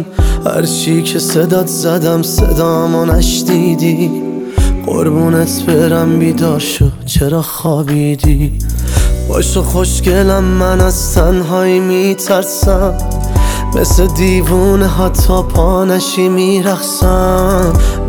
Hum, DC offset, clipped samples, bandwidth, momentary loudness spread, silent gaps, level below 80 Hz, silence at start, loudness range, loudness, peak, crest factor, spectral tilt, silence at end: none; under 0.1%; under 0.1%; over 20 kHz; 4 LU; none; -16 dBFS; 0 s; 2 LU; -12 LUFS; 0 dBFS; 10 dB; -5.5 dB/octave; 0 s